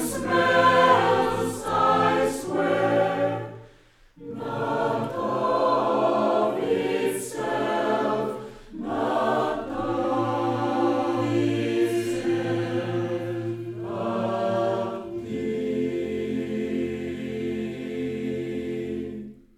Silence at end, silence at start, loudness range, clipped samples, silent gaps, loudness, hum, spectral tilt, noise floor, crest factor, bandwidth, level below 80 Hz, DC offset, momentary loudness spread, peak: 0.25 s; 0 s; 6 LU; under 0.1%; none; -25 LUFS; none; -5.5 dB/octave; -55 dBFS; 18 dB; 15.5 kHz; -54 dBFS; under 0.1%; 11 LU; -6 dBFS